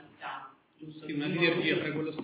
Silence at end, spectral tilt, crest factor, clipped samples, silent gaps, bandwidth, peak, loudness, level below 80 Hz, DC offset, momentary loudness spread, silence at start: 0 s; -3.5 dB/octave; 20 dB; under 0.1%; none; 4 kHz; -12 dBFS; -30 LUFS; -76 dBFS; under 0.1%; 20 LU; 0 s